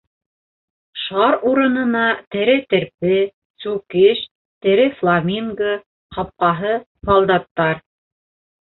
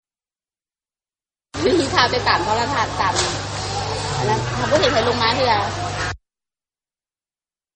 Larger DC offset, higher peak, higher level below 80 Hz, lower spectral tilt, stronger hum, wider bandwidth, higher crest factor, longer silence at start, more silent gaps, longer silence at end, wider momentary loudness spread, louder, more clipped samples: neither; about the same, -2 dBFS vs -2 dBFS; second, -50 dBFS vs -42 dBFS; first, -10.5 dB/octave vs -4 dB/octave; neither; second, 4.2 kHz vs 9 kHz; about the same, 16 dB vs 20 dB; second, 0.95 s vs 1.55 s; first, 2.27-2.31 s, 3.34-3.54 s, 4.31-4.61 s, 5.86-6.10 s, 6.86-6.95 s, 7.51-7.55 s vs none; second, 0.95 s vs 1.6 s; first, 13 LU vs 8 LU; about the same, -18 LUFS vs -19 LUFS; neither